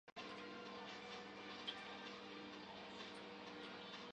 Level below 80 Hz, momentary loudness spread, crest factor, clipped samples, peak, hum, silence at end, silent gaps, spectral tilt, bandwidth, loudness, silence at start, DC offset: -84 dBFS; 5 LU; 20 dB; under 0.1%; -34 dBFS; 60 Hz at -75 dBFS; 0 s; 0.12-0.16 s; -3.5 dB/octave; 9.6 kHz; -52 LUFS; 0.05 s; under 0.1%